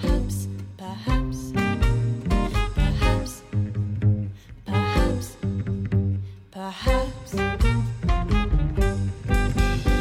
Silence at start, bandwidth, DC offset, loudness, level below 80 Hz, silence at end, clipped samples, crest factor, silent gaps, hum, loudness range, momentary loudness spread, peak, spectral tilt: 0 s; 14.5 kHz; under 0.1%; -25 LUFS; -26 dBFS; 0 s; under 0.1%; 16 dB; none; none; 2 LU; 8 LU; -6 dBFS; -6.5 dB/octave